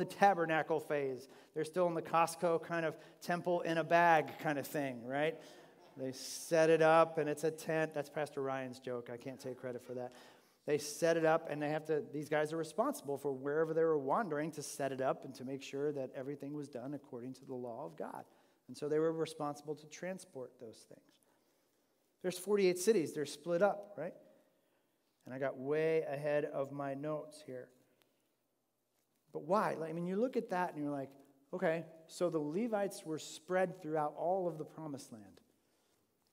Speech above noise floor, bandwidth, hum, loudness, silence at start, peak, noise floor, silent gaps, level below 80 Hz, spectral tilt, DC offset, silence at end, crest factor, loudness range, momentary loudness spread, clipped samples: 46 dB; 16 kHz; none; -37 LUFS; 0 s; -14 dBFS; -83 dBFS; none; under -90 dBFS; -5 dB/octave; under 0.1%; 1 s; 24 dB; 8 LU; 15 LU; under 0.1%